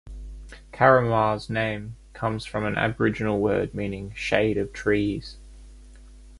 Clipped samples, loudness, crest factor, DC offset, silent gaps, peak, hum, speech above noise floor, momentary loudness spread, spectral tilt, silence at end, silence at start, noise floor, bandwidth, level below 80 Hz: under 0.1%; -24 LUFS; 22 dB; under 0.1%; none; -2 dBFS; none; 23 dB; 23 LU; -6.5 dB/octave; 0 s; 0.05 s; -46 dBFS; 11.5 kHz; -44 dBFS